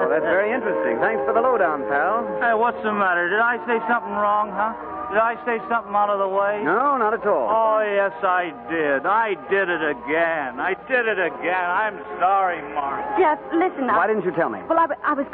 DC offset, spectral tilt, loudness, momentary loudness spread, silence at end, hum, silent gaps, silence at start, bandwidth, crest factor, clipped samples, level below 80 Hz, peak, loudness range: under 0.1%; -9.5 dB/octave; -21 LUFS; 5 LU; 0 s; none; none; 0 s; 4.4 kHz; 14 dB; under 0.1%; -60 dBFS; -8 dBFS; 2 LU